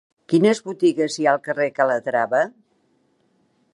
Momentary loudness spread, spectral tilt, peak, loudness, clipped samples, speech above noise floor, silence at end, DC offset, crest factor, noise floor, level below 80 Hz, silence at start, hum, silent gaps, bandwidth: 4 LU; -5.5 dB/octave; -2 dBFS; -20 LUFS; under 0.1%; 45 dB; 1.25 s; under 0.1%; 18 dB; -64 dBFS; -76 dBFS; 0.3 s; none; none; 11.5 kHz